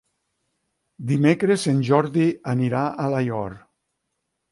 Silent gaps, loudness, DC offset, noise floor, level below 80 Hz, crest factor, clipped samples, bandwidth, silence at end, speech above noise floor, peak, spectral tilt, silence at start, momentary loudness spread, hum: none; -21 LUFS; under 0.1%; -77 dBFS; -60 dBFS; 18 dB; under 0.1%; 11.5 kHz; 0.95 s; 57 dB; -4 dBFS; -7 dB/octave; 1 s; 9 LU; none